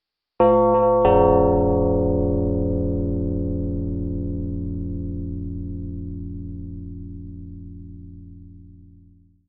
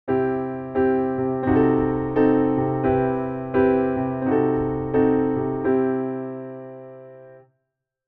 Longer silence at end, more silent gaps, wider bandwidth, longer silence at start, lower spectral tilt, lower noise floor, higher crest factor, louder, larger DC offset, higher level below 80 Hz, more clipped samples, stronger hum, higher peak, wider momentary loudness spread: about the same, 0.65 s vs 0.7 s; neither; about the same, 3.7 kHz vs 4 kHz; first, 0.4 s vs 0.05 s; first, -13.5 dB/octave vs -12 dB/octave; second, -52 dBFS vs -79 dBFS; first, 20 dB vs 14 dB; about the same, -21 LUFS vs -22 LUFS; neither; first, -34 dBFS vs -48 dBFS; neither; neither; first, -4 dBFS vs -8 dBFS; first, 22 LU vs 12 LU